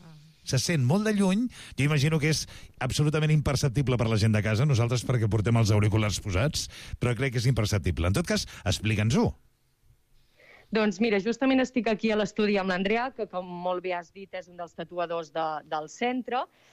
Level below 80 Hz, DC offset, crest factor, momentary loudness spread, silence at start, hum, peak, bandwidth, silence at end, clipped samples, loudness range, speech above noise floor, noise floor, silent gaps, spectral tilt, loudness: -46 dBFS; under 0.1%; 12 dB; 10 LU; 0.05 s; none; -14 dBFS; 15 kHz; 0.25 s; under 0.1%; 5 LU; 37 dB; -63 dBFS; none; -5.5 dB/octave; -27 LUFS